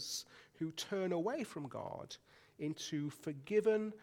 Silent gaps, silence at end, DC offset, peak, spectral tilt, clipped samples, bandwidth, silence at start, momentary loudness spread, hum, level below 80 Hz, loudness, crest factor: none; 0 s; under 0.1%; -22 dBFS; -4.5 dB/octave; under 0.1%; 17 kHz; 0 s; 14 LU; none; -80 dBFS; -40 LUFS; 18 dB